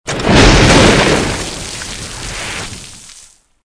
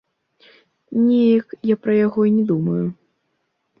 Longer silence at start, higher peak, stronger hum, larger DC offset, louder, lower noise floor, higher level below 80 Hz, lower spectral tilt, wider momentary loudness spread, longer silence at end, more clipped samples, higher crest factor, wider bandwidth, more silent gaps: second, 0.05 s vs 0.9 s; first, 0 dBFS vs -6 dBFS; neither; neither; first, -10 LUFS vs -18 LUFS; second, -43 dBFS vs -71 dBFS; first, -22 dBFS vs -64 dBFS; second, -4 dB/octave vs -11 dB/octave; first, 17 LU vs 8 LU; second, 0.45 s vs 0.85 s; first, 0.3% vs under 0.1%; about the same, 12 dB vs 14 dB; first, 11 kHz vs 5.4 kHz; neither